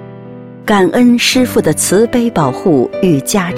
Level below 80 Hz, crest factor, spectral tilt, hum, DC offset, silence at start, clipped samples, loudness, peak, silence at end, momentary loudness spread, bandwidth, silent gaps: -42 dBFS; 12 dB; -4.5 dB/octave; none; under 0.1%; 0 s; under 0.1%; -11 LUFS; 0 dBFS; 0 s; 14 LU; 16.5 kHz; none